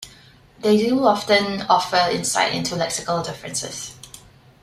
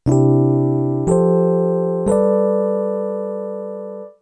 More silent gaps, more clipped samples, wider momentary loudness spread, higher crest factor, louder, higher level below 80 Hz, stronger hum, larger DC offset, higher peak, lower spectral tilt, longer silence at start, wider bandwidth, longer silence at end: neither; neither; first, 16 LU vs 13 LU; first, 20 dB vs 12 dB; second, -20 LUFS vs -17 LUFS; second, -56 dBFS vs -44 dBFS; neither; neither; about the same, -2 dBFS vs -4 dBFS; second, -3.5 dB/octave vs -10 dB/octave; about the same, 0 s vs 0.05 s; first, 15.5 kHz vs 10 kHz; first, 0.45 s vs 0.1 s